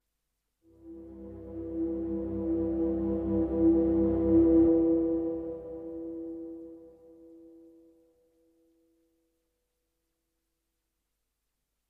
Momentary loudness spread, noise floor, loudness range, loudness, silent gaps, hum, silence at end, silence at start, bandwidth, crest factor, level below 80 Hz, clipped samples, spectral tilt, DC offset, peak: 23 LU; -82 dBFS; 19 LU; -28 LUFS; none; none; 4.5 s; 0.85 s; 2.2 kHz; 18 dB; -48 dBFS; under 0.1%; -12.5 dB/octave; under 0.1%; -14 dBFS